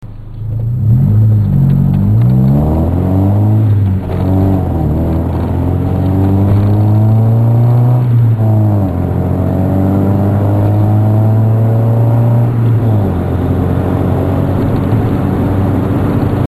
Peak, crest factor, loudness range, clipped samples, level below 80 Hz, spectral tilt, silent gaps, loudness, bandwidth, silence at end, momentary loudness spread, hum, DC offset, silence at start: 0 dBFS; 10 dB; 2 LU; under 0.1%; -26 dBFS; -10.5 dB/octave; none; -11 LUFS; 12.5 kHz; 0 s; 5 LU; none; under 0.1%; 0 s